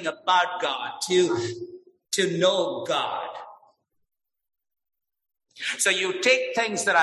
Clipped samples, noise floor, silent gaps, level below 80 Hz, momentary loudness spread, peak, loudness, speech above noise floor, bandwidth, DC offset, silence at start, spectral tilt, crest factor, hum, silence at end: under 0.1%; -63 dBFS; none; -72 dBFS; 12 LU; -6 dBFS; -24 LUFS; 39 dB; 12.5 kHz; under 0.1%; 0 s; -2.5 dB/octave; 20 dB; none; 0 s